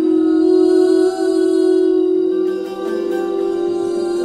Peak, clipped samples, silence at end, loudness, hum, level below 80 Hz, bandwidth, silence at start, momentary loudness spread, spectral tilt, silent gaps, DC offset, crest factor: -4 dBFS; under 0.1%; 0 s; -16 LUFS; none; -58 dBFS; 10.5 kHz; 0 s; 8 LU; -5.5 dB/octave; none; under 0.1%; 10 dB